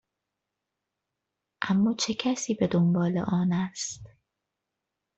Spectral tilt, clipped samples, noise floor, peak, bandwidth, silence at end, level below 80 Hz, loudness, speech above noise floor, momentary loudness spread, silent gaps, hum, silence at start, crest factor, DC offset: -5.5 dB/octave; under 0.1%; -85 dBFS; -10 dBFS; 8.2 kHz; 1.1 s; -64 dBFS; -27 LUFS; 59 dB; 11 LU; none; none; 1.6 s; 20 dB; under 0.1%